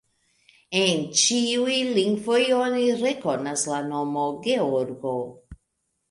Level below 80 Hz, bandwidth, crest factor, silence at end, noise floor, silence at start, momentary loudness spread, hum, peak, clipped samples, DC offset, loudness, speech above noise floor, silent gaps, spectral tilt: -60 dBFS; 11.5 kHz; 18 dB; 0.55 s; -76 dBFS; 0.7 s; 8 LU; none; -6 dBFS; under 0.1%; under 0.1%; -23 LUFS; 53 dB; none; -3 dB/octave